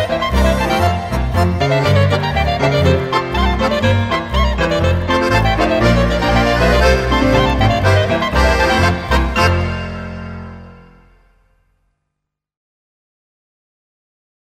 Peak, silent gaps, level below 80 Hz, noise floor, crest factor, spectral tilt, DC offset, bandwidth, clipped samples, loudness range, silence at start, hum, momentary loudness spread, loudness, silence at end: 0 dBFS; none; -22 dBFS; -77 dBFS; 16 dB; -6 dB/octave; under 0.1%; 15 kHz; under 0.1%; 8 LU; 0 s; 50 Hz at -40 dBFS; 6 LU; -14 LUFS; 3.65 s